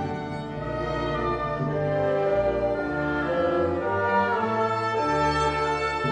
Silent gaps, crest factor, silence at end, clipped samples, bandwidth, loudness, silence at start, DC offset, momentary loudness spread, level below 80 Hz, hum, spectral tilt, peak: none; 14 dB; 0 s; under 0.1%; 9.4 kHz; -25 LUFS; 0 s; under 0.1%; 6 LU; -44 dBFS; none; -6.5 dB/octave; -10 dBFS